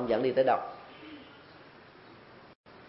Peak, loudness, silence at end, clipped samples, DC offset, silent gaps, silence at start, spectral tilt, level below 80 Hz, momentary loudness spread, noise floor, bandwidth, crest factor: -12 dBFS; -29 LUFS; 0.1 s; under 0.1%; under 0.1%; 2.55-2.64 s; 0 s; -9 dB/octave; -70 dBFS; 26 LU; -54 dBFS; 5.8 kHz; 20 dB